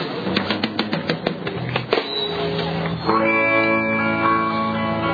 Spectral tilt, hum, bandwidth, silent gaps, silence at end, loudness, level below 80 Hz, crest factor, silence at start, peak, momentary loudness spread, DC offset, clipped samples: -7 dB/octave; none; 5 kHz; none; 0 s; -20 LUFS; -50 dBFS; 18 dB; 0 s; -2 dBFS; 8 LU; under 0.1%; under 0.1%